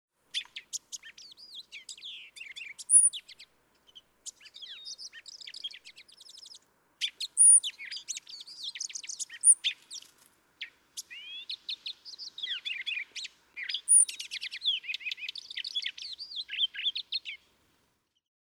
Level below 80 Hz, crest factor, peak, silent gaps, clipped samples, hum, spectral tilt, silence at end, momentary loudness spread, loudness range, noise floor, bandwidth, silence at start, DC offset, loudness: -84 dBFS; 22 dB; -10 dBFS; none; under 0.1%; none; 6 dB/octave; 1.1 s; 24 LU; 14 LU; -75 dBFS; over 20 kHz; 0.35 s; under 0.1%; -26 LUFS